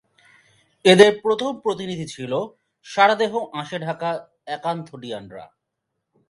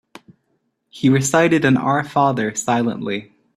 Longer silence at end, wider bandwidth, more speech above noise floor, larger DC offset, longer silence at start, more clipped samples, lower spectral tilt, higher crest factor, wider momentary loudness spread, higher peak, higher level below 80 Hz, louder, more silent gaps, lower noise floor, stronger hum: first, 0.85 s vs 0.35 s; second, 11.5 kHz vs 13.5 kHz; first, 59 dB vs 52 dB; neither; about the same, 0.85 s vs 0.95 s; neither; about the same, -4.5 dB/octave vs -5 dB/octave; first, 22 dB vs 16 dB; first, 20 LU vs 9 LU; about the same, 0 dBFS vs -2 dBFS; second, -66 dBFS vs -56 dBFS; about the same, -20 LUFS vs -18 LUFS; neither; first, -79 dBFS vs -69 dBFS; neither